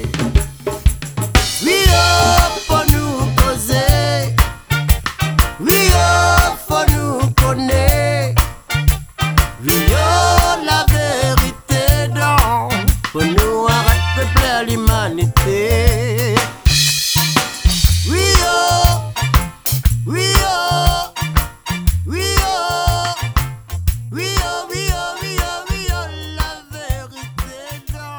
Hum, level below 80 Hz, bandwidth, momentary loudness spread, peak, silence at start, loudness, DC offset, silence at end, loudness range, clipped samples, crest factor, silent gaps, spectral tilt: none; -20 dBFS; over 20 kHz; 10 LU; 0 dBFS; 0 s; -15 LUFS; under 0.1%; 0 s; 6 LU; under 0.1%; 14 dB; none; -4 dB/octave